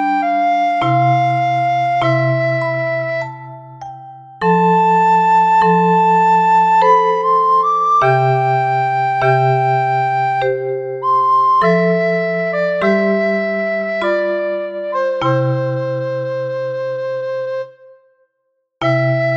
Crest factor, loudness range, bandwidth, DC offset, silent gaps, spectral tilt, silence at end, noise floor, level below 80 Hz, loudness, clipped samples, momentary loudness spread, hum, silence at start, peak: 14 dB; 8 LU; 7.6 kHz; under 0.1%; none; -7.5 dB/octave; 0 s; -69 dBFS; -58 dBFS; -15 LUFS; under 0.1%; 10 LU; none; 0 s; -2 dBFS